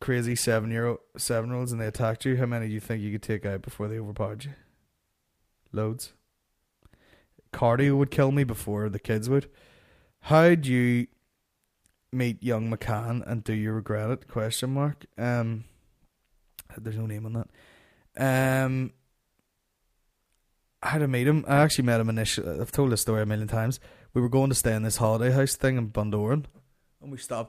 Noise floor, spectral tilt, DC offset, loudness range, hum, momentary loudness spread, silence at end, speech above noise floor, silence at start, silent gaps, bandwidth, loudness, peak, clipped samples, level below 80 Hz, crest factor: -76 dBFS; -5.5 dB/octave; under 0.1%; 9 LU; none; 12 LU; 0 s; 50 dB; 0 s; none; 15.5 kHz; -27 LUFS; -8 dBFS; under 0.1%; -52 dBFS; 20 dB